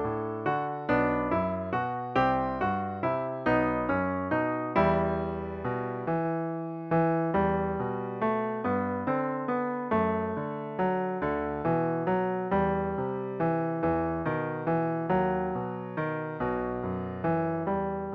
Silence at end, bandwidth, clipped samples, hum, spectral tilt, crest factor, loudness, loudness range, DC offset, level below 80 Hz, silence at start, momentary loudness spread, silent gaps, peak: 0 s; 5.8 kHz; under 0.1%; none; -10 dB/octave; 18 dB; -29 LUFS; 2 LU; under 0.1%; -52 dBFS; 0 s; 6 LU; none; -12 dBFS